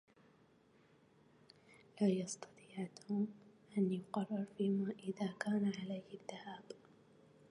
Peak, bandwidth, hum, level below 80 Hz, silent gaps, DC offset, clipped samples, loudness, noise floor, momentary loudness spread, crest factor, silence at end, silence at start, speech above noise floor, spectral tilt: -22 dBFS; 11 kHz; none; -84 dBFS; none; under 0.1%; under 0.1%; -41 LUFS; -70 dBFS; 15 LU; 20 dB; 0.75 s; 1.95 s; 30 dB; -6.5 dB/octave